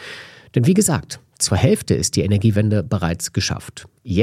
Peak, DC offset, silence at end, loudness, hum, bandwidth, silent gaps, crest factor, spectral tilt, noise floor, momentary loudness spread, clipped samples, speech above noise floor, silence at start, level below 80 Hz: 0 dBFS; under 0.1%; 0 s; -19 LUFS; none; 15.5 kHz; none; 18 dB; -5 dB/octave; -38 dBFS; 18 LU; under 0.1%; 20 dB; 0 s; -42 dBFS